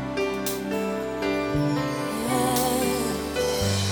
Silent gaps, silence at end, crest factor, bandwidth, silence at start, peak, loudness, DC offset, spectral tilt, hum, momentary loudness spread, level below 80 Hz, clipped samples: none; 0 s; 16 dB; over 20 kHz; 0 s; -10 dBFS; -25 LUFS; under 0.1%; -4.5 dB/octave; none; 5 LU; -46 dBFS; under 0.1%